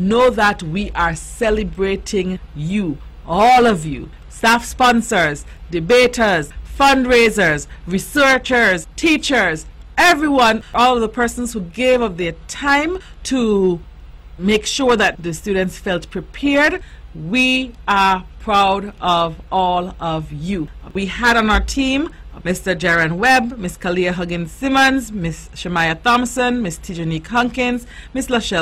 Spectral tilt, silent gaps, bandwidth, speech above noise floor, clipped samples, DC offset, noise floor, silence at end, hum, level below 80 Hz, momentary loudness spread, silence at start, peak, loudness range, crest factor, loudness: -4 dB/octave; none; 16 kHz; 20 dB; under 0.1%; under 0.1%; -37 dBFS; 0 s; none; -34 dBFS; 12 LU; 0 s; -4 dBFS; 4 LU; 12 dB; -16 LUFS